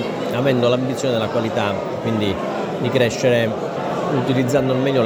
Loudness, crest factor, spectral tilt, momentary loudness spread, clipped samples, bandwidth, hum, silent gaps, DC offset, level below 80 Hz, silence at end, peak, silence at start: -19 LUFS; 16 dB; -6 dB/octave; 6 LU; under 0.1%; over 20 kHz; none; none; under 0.1%; -52 dBFS; 0 s; -4 dBFS; 0 s